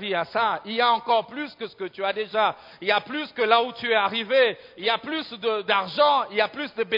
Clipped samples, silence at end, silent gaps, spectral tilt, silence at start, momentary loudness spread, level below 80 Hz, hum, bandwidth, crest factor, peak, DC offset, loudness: under 0.1%; 0 s; none; -5.5 dB/octave; 0 s; 10 LU; -72 dBFS; none; 5.4 kHz; 20 dB; -4 dBFS; under 0.1%; -23 LUFS